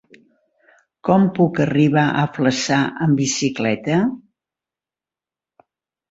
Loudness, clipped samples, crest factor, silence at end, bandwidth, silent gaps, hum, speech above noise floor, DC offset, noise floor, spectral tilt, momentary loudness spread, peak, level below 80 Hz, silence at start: -18 LUFS; under 0.1%; 18 dB; 1.9 s; 8 kHz; none; none; 73 dB; under 0.1%; -90 dBFS; -5.5 dB/octave; 5 LU; -2 dBFS; -58 dBFS; 1.05 s